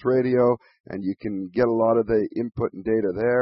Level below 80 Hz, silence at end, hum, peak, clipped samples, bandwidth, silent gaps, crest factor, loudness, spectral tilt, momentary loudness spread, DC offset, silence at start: -52 dBFS; 0 s; none; -8 dBFS; under 0.1%; 5.8 kHz; 0.80-0.84 s; 14 dB; -23 LUFS; -12 dB/octave; 10 LU; under 0.1%; 0.05 s